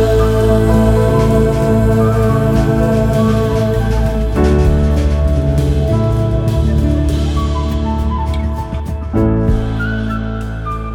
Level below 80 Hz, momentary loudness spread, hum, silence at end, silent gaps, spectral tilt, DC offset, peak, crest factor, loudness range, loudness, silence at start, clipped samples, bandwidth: -18 dBFS; 7 LU; none; 0 s; none; -8 dB/octave; under 0.1%; 0 dBFS; 12 dB; 5 LU; -14 LUFS; 0 s; under 0.1%; 15.5 kHz